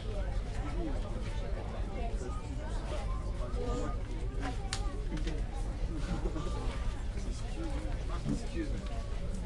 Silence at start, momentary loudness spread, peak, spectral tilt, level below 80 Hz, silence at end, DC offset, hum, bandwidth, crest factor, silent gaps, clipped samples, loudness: 0 s; 3 LU; -14 dBFS; -6 dB/octave; -36 dBFS; 0 s; under 0.1%; none; 11.5 kHz; 20 dB; none; under 0.1%; -39 LUFS